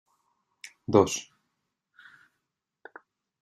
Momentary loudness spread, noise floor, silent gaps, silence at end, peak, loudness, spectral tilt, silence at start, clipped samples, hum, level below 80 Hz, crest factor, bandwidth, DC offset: 27 LU; -83 dBFS; none; 2.2 s; -6 dBFS; -25 LUFS; -5 dB/octave; 0.9 s; under 0.1%; none; -70 dBFS; 26 dB; 13 kHz; under 0.1%